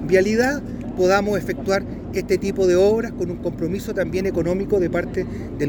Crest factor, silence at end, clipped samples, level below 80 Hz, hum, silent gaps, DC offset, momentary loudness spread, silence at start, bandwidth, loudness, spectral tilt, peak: 16 dB; 0 s; under 0.1%; -40 dBFS; none; none; under 0.1%; 10 LU; 0 s; over 20 kHz; -21 LUFS; -6 dB/octave; -4 dBFS